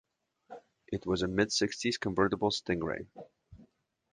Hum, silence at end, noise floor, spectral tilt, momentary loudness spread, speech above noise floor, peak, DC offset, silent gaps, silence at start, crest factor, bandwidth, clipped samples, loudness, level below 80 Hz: none; 0.5 s; -66 dBFS; -4 dB/octave; 23 LU; 34 dB; -10 dBFS; under 0.1%; none; 0.5 s; 24 dB; 10 kHz; under 0.1%; -32 LUFS; -58 dBFS